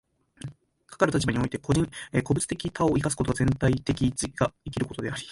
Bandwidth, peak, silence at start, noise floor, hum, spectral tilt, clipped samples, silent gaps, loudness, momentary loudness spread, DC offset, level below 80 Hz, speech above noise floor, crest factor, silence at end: 11.5 kHz; -6 dBFS; 0.45 s; -52 dBFS; none; -5.5 dB/octave; under 0.1%; none; -27 LUFS; 9 LU; under 0.1%; -44 dBFS; 26 dB; 20 dB; 0 s